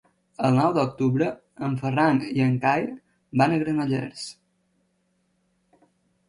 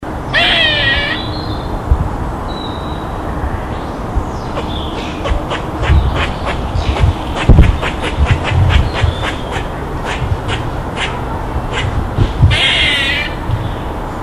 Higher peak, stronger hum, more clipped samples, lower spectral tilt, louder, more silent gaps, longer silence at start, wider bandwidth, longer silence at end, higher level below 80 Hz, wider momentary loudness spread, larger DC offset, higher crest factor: second, -6 dBFS vs 0 dBFS; neither; second, under 0.1% vs 0.2%; first, -7 dB/octave vs -5.5 dB/octave; second, -24 LUFS vs -15 LUFS; neither; first, 0.4 s vs 0 s; second, 11 kHz vs 12.5 kHz; first, 1.95 s vs 0 s; second, -62 dBFS vs -20 dBFS; about the same, 13 LU vs 11 LU; neither; about the same, 18 dB vs 14 dB